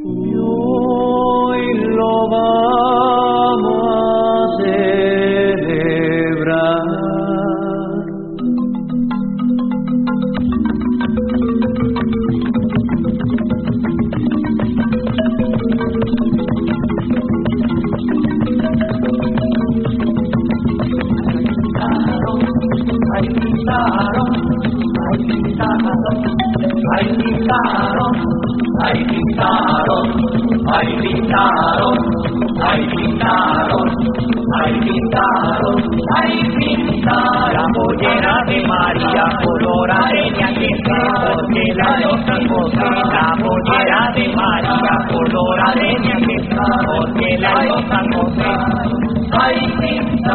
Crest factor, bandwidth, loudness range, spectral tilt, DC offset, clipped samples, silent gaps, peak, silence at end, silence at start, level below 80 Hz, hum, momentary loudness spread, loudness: 14 dB; 4.4 kHz; 3 LU; -5 dB/octave; under 0.1%; under 0.1%; none; 0 dBFS; 0 s; 0 s; -34 dBFS; none; 4 LU; -15 LUFS